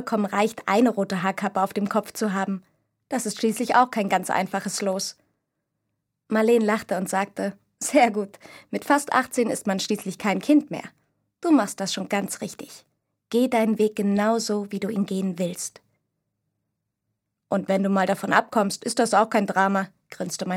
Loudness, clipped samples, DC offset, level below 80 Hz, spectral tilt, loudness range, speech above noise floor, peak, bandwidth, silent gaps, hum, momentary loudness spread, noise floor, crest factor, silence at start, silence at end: -24 LUFS; under 0.1%; under 0.1%; -72 dBFS; -4.5 dB/octave; 3 LU; 57 dB; -2 dBFS; 16.5 kHz; none; none; 11 LU; -80 dBFS; 22 dB; 0 s; 0 s